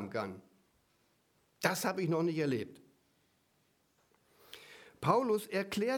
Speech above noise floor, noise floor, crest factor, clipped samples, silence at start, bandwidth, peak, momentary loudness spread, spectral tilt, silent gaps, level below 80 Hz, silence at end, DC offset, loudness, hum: 41 dB; -74 dBFS; 24 dB; under 0.1%; 0 s; 19.5 kHz; -12 dBFS; 22 LU; -5 dB/octave; none; -76 dBFS; 0 s; under 0.1%; -34 LUFS; none